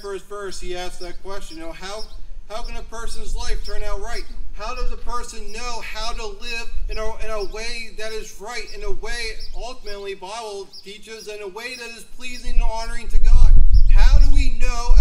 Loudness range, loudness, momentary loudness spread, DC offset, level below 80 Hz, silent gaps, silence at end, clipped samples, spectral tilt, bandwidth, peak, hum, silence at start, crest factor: 11 LU; -27 LUFS; 16 LU; under 0.1%; -18 dBFS; none; 0 s; under 0.1%; -4.5 dB/octave; 11 kHz; 0 dBFS; none; 0.05 s; 14 dB